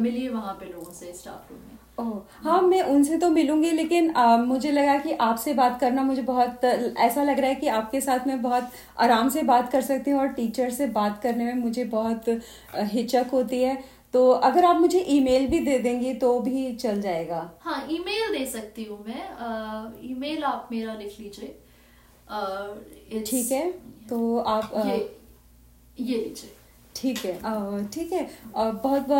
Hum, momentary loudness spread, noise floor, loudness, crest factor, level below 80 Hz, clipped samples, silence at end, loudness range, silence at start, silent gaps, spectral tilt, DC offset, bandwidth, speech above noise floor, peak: none; 16 LU; -55 dBFS; -24 LUFS; 18 dB; -56 dBFS; under 0.1%; 0 s; 10 LU; 0 s; none; -4.5 dB/octave; under 0.1%; 16.5 kHz; 30 dB; -6 dBFS